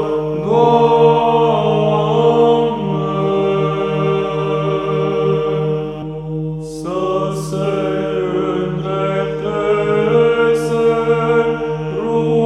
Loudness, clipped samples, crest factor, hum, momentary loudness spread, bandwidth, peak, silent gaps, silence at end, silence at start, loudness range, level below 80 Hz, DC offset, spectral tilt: -16 LUFS; under 0.1%; 16 dB; 50 Hz at -45 dBFS; 9 LU; 11 kHz; 0 dBFS; none; 0 s; 0 s; 6 LU; -44 dBFS; under 0.1%; -7.5 dB/octave